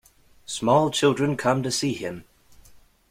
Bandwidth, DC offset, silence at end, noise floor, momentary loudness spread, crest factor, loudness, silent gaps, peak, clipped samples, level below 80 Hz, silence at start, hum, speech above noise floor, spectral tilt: 16 kHz; under 0.1%; 0.9 s; -53 dBFS; 14 LU; 20 dB; -23 LUFS; none; -6 dBFS; under 0.1%; -58 dBFS; 0.5 s; none; 30 dB; -4.5 dB/octave